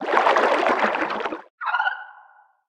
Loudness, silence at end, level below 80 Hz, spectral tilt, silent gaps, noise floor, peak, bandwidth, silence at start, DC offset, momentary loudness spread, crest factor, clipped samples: -22 LUFS; 0.55 s; -68 dBFS; -3.5 dB/octave; 1.50-1.58 s; -53 dBFS; -2 dBFS; 11 kHz; 0 s; under 0.1%; 12 LU; 20 dB; under 0.1%